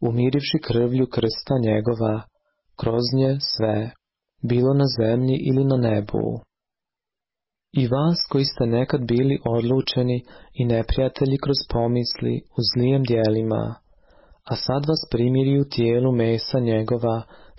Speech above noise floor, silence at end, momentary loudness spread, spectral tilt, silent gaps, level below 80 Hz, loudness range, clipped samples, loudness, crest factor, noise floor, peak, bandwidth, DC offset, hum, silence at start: 68 dB; 0.25 s; 7 LU; -10 dB/octave; none; -42 dBFS; 2 LU; under 0.1%; -22 LUFS; 12 dB; -89 dBFS; -8 dBFS; 5.8 kHz; under 0.1%; none; 0 s